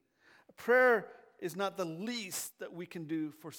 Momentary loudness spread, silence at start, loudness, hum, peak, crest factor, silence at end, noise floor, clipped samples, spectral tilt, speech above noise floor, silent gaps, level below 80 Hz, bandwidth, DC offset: 18 LU; 0.6 s; -33 LUFS; none; -16 dBFS; 20 dB; 0 s; -65 dBFS; under 0.1%; -3.5 dB/octave; 31 dB; none; -88 dBFS; 19 kHz; under 0.1%